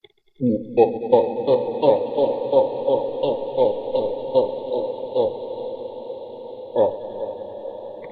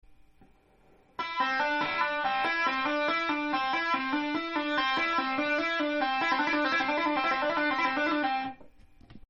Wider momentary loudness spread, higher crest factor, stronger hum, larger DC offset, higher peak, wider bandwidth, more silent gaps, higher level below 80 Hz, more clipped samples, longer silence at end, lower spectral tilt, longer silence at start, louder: first, 15 LU vs 4 LU; first, 20 dB vs 14 dB; neither; neither; first, -2 dBFS vs -14 dBFS; second, 4.7 kHz vs 7 kHz; neither; about the same, -62 dBFS vs -64 dBFS; neither; about the same, 0 s vs 0.1 s; first, -10 dB/octave vs -3.5 dB/octave; first, 0.4 s vs 0.1 s; first, -22 LUFS vs -28 LUFS